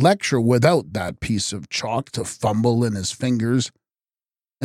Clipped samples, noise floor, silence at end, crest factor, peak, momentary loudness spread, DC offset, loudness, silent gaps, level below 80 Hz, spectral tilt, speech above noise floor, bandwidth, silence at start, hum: under 0.1%; under -90 dBFS; 0 s; 18 dB; -4 dBFS; 9 LU; under 0.1%; -21 LUFS; none; -50 dBFS; -5.5 dB/octave; over 70 dB; 14.5 kHz; 0 s; none